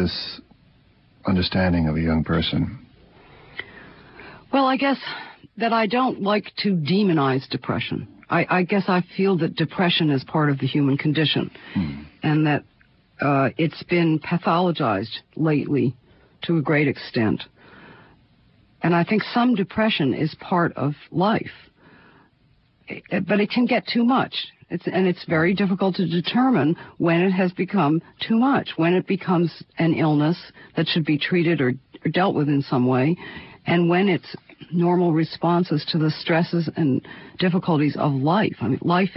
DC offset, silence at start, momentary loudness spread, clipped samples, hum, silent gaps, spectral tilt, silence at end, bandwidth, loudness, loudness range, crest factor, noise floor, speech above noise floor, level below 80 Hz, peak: under 0.1%; 0 s; 9 LU; under 0.1%; none; none; -11 dB/octave; 0 s; 5.8 kHz; -22 LUFS; 4 LU; 16 dB; -60 dBFS; 39 dB; -48 dBFS; -6 dBFS